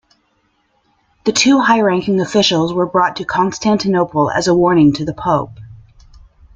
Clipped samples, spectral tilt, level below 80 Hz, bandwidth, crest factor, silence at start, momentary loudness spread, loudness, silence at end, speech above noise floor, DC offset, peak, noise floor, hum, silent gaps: under 0.1%; -4.5 dB/octave; -48 dBFS; 9.4 kHz; 16 dB; 1.25 s; 6 LU; -14 LUFS; 0.8 s; 48 dB; under 0.1%; 0 dBFS; -61 dBFS; none; none